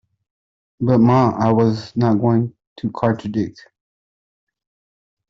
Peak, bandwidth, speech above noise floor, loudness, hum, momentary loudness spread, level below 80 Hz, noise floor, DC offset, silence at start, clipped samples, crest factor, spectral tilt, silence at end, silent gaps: -2 dBFS; 7.4 kHz; over 73 dB; -18 LUFS; none; 14 LU; -54 dBFS; under -90 dBFS; under 0.1%; 0.8 s; under 0.1%; 18 dB; -9 dB/octave; 1.8 s; 2.67-2.76 s